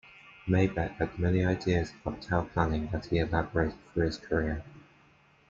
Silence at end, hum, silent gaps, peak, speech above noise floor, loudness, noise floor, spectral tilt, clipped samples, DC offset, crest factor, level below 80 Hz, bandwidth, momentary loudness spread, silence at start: 0.7 s; none; none; -10 dBFS; 33 dB; -30 LUFS; -62 dBFS; -7.5 dB/octave; under 0.1%; under 0.1%; 20 dB; -46 dBFS; 7.4 kHz; 7 LU; 0.25 s